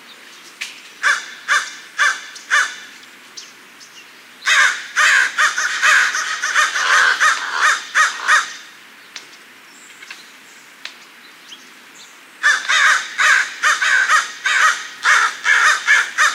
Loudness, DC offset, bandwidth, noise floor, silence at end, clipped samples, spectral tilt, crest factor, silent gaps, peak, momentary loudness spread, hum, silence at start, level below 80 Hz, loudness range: -14 LUFS; under 0.1%; 16 kHz; -42 dBFS; 0 s; under 0.1%; 3.5 dB/octave; 16 dB; none; -2 dBFS; 22 LU; none; 0.1 s; -74 dBFS; 7 LU